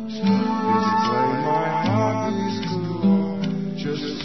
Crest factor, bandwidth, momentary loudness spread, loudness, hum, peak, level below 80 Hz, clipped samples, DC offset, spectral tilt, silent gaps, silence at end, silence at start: 14 dB; 6.2 kHz; 6 LU; -22 LUFS; none; -8 dBFS; -58 dBFS; under 0.1%; 0.6%; -7 dB/octave; none; 0 s; 0 s